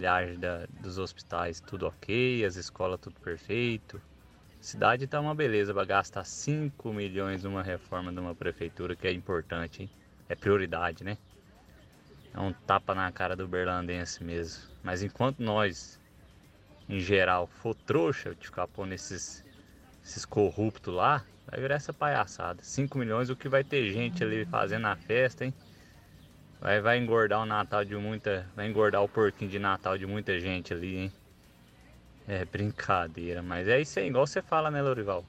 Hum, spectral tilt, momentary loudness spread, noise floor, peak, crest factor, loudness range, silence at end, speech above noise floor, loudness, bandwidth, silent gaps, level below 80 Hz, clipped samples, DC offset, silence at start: none; -5.5 dB/octave; 12 LU; -58 dBFS; -10 dBFS; 22 dB; 5 LU; 0 s; 27 dB; -31 LUFS; 14.5 kHz; none; -58 dBFS; under 0.1%; under 0.1%; 0 s